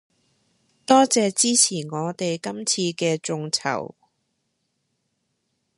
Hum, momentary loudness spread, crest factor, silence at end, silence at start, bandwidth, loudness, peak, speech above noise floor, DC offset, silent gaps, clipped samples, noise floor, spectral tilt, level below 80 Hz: none; 12 LU; 22 dB; 1.9 s; 0.9 s; 11.5 kHz; -21 LUFS; -2 dBFS; 53 dB; under 0.1%; none; under 0.1%; -74 dBFS; -3 dB/octave; -74 dBFS